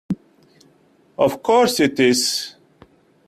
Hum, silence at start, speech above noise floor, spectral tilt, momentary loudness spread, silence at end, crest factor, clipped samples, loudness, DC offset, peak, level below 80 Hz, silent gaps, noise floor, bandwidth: none; 0.1 s; 39 dB; -3.5 dB/octave; 15 LU; 0.8 s; 18 dB; under 0.1%; -18 LUFS; under 0.1%; -4 dBFS; -60 dBFS; none; -56 dBFS; 16 kHz